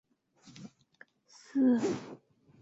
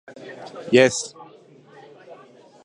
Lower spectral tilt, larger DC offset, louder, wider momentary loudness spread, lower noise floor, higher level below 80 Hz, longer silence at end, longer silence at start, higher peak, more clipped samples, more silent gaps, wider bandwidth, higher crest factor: first, -6 dB/octave vs -4 dB/octave; neither; second, -30 LUFS vs -18 LUFS; first, 26 LU vs 22 LU; first, -62 dBFS vs -49 dBFS; second, -76 dBFS vs -64 dBFS; about the same, 0.45 s vs 0.5 s; first, 0.45 s vs 0.1 s; second, -18 dBFS vs 0 dBFS; neither; neither; second, 7.8 kHz vs 11.5 kHz; second, 16 dB vs 24 dB